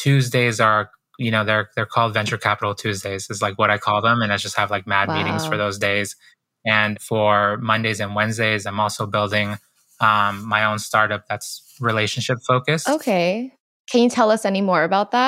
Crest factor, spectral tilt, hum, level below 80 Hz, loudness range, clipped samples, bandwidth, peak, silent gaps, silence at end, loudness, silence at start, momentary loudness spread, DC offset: 18 dB; -4.5 dB/octave; none; -66 dBFS; 1 LU; under 0.1%; 16 kHz; -2 dBFS; 13.60-13.85 s; 0 s; -20 LUFS; 0 s; 8 LU; under 0.1%